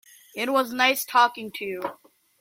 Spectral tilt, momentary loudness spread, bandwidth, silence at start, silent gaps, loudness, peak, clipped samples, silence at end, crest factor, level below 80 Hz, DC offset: -1.5 dB/octave; 14 LU; 16.5 kHz; 0.35 s; none; -23 LUFS; -6 dBFS; under 0.1%; 0.45 s; 20 dB; -74 dBFS; under 0.1%